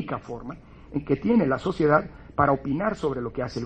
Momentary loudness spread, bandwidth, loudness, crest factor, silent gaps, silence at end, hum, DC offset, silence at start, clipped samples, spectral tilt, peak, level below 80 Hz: 15 LU; 9 kHz; -25 LUFS; 20 dB; none; 0 s; none; under 0.1%; 0 s; under 0.1%; -8 dB/octave; -6 dBFS; -48 dBFS